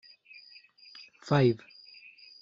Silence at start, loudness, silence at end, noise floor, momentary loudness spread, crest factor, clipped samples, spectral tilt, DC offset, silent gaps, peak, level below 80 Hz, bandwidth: 1.25 s; -27 LUFS; 0.85 s; -55 dBFS; 26 LU; 22 dB; under 0.1%; -6.5 dB/octave; under 0.1%; none; -12 dBFS; -70 dBFS; 7.8 kHz